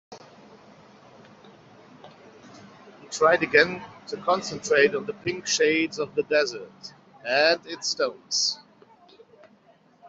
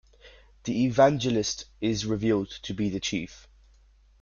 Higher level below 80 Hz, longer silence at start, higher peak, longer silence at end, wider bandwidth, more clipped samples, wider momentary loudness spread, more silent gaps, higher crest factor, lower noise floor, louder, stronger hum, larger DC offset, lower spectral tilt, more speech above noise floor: second, -70 dBFS vs -54 dBFS; second, 0.1 s vs 0.25 s; first, -4 dBFS vs -8 dBFS; second, 0 s vs 0.85 s; about the same, 8 kHz vs 7.4 kHz; neither; first, 17 LU vs 13 LU; neither; about the same, 24 dB vs 20 dB; about the same, -58 dBFS vs -58 dBFS; first, -23 LUFS vs -27 LUFS; neither; neither; second, -2 dB/octave vs -5 dB/octave; about the same, 34 dB vs 32 dB